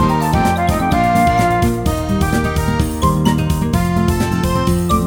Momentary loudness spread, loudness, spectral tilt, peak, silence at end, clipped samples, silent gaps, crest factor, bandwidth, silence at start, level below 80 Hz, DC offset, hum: 4 LU; -16 LUFS; -6 dB/octave; 0 dBFS; 0 s; under 0.1%; none; 14 dB; over 20 kHz; 0 s; -24 dBFS; under 0.1%; none